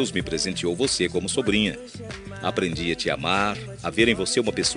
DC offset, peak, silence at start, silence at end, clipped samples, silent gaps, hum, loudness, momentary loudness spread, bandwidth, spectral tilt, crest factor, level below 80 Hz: under 0.1%; -4 dBFS; 0 s; 0 s; under 0.1%; none; none; -24 LUFS; 10 LU; 11 kHz; -3.5 dB/octave; 20 dB; -48 dBFS